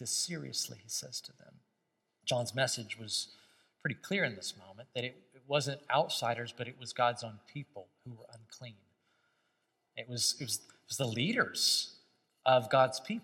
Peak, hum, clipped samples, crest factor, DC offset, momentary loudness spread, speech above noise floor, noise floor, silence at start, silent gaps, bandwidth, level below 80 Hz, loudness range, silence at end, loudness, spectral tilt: -12 dBFS; none; under 0.1%; 24 dB; under 0.1%; 22 LU; 47 dB; -82 dBFS; 0 s; none; 16.5 kHz; -84 dBFS; 8 LU; 0 s; -34 LUFS; -3 dB/octave